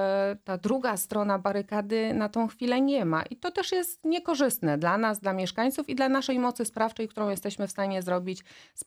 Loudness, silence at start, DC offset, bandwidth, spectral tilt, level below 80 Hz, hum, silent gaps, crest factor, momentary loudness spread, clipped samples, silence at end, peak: -28 LUFS; 0 s; under 0.1%; 19.5 kHz; -4.5 dB/octave; -68 dBFS; none; none; 16 dB; 6 LU; under 0.1%; 0.05 s; -12 dBFS